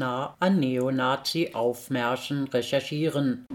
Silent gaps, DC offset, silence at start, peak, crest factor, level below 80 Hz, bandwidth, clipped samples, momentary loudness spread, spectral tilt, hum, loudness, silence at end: none; under 0.1%; 0 s; -12 dBFS; 16 dB; -68 dBFS; 18 kHz; under 0.1%; 4 LU; -5.5 dB/octave; none; -27 LUFS; 0 s